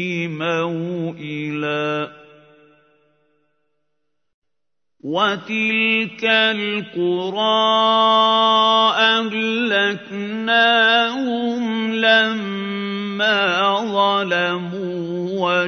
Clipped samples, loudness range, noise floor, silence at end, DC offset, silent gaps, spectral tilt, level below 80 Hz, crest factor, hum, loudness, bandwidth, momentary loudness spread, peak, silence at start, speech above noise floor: under 0.1%; 12 LU; -84 dBFS; 0 s; under 0.1%; 4.34-4.42 s; -4.5 dB/octave; -74 dBFS; 18 dB; none; -18 LUFS; 6.6 kHz; 11 LU; -2 dBFS; 0 s; 65 dB